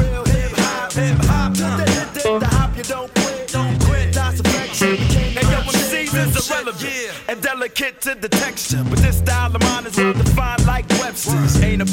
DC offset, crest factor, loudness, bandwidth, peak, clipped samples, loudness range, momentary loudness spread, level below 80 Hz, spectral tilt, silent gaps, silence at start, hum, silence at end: under 0.1%; 14 dB; -18 LUFS; 17 kHz; -4 dBFS; under 0.1%; 2 LU; 5 LU; -24 dBFS; -4.5 dB/octave; none; 0 s; none; 0 s